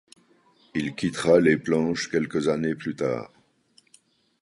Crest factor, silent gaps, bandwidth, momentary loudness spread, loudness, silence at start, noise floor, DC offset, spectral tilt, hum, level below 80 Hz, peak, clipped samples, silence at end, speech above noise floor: 22 dB; none; 11.5 kHz; 12 LU; -24 LUFS; 0.75 s; -62 dBFS; under 0.1%; -5.5 dB/octave; none; -58 dBFS; -4 dBFS; under 0.1%; 1.15 s; 39 dB